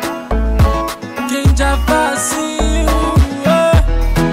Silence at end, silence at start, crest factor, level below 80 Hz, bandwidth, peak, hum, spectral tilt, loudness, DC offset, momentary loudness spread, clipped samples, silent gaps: 0 s; 0 s; 10 dB; -16 dBFS; 16 kHz; -4 dBFS; none; -5.5 dB/octave; -14 LUFS; under 0.1%; 7 LU; under 0.1%; none